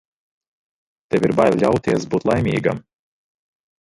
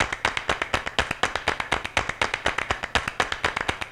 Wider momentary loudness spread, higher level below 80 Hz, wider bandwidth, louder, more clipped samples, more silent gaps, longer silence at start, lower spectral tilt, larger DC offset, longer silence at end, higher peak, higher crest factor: first, 8 LU vs 2 LU; second, -48 dBFS vs -42 dBFS; second, 11.5 kHz vs 16 kHz; first, -19 LUFS vs -25 LUFS; neither; neither; first, 1.1 s vs 0 s; first, -7 dB/octave vs -2.5 dB/octave; neither; first, 1 s vs 0 s; about the same, -2 dBFS vs -4 dBFS; second, 18 dB vs 24 dB